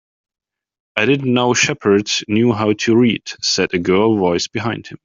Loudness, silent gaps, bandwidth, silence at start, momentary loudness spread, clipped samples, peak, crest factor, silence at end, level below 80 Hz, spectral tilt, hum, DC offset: -16 LUFS; none; 7.6 kHz; 0.95 s; 6 LU; under 0.1%; 0 dBFS; 16 dB; 0.1 s; -56 dBFS; -4.5 dB/octave; none; under 0.1%